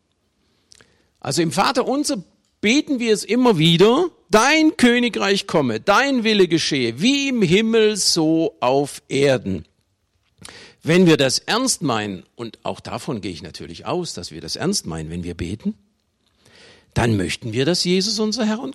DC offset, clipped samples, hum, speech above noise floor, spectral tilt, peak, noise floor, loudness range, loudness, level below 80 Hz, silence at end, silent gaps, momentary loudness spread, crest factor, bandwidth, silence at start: under 0.1%; under 0.1%; none; 48 dB; -4.5 dB/octave; -4 dBFS; -67 dBFS; 10 LU; -18 LUFS; -50 dBFS; 0 s; none; 15 LU; 16 dB; 16 kHz; 1.25 s